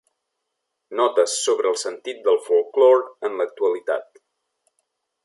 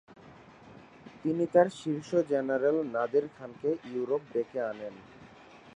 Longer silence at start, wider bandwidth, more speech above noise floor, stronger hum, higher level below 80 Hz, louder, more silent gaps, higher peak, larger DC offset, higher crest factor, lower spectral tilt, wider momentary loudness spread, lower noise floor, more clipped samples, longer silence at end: first, 0.9 s vs 0.1 s; about the same, 11.5 kHz vs 10.5 kHz; first, 59 dB vs 24 dB; neither; second, -84 dBFS vs -72 dBFS; first, -21 LUFS vs -30 LUFS; neither; first, -4 dBFS vs -10 dBFS; neither; about the same, 18 dB vs 22 dB; second, -0.5 dB/octave vs -7 dB/octave; second, 12 LU vs 16 LU; first, -79 dBFS vs -53 dBFS; neither; first, 1.2 s vs 0.05 s